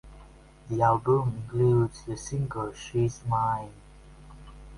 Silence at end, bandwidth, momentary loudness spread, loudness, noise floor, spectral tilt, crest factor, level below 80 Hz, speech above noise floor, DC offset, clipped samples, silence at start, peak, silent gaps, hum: 0 s; 11.5 kHz; 11 LU; -27 LUFS; -51 dBFS; -7.5 dB/octave; 20 dB; -50 dBFS; 24 dB; under 0.1%; under 0.1%; 0.05 s; -8 dBFS; none; none